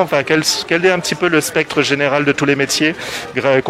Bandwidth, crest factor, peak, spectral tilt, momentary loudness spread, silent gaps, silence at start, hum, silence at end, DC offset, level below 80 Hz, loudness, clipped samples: 16 kHz; 16 dB; 0 dBFS; -3.5 dB/octave; 3 LU; none; 0 s; none; 0 s; under 0.1%; -52 dBFS; -15 LUFS; under 0.1%